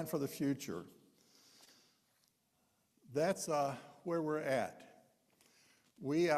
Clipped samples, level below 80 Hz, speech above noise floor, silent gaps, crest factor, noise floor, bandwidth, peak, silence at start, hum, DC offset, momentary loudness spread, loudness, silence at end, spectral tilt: under 0.1%; -82 dBFS; 42 dB; none; 20 dB; -78 dBFS; 15 kHz; -20 dBFS; 0 s; none; under 0.1%; 12 LU; -39 LUFS; 0 s; -5.5 dB/octave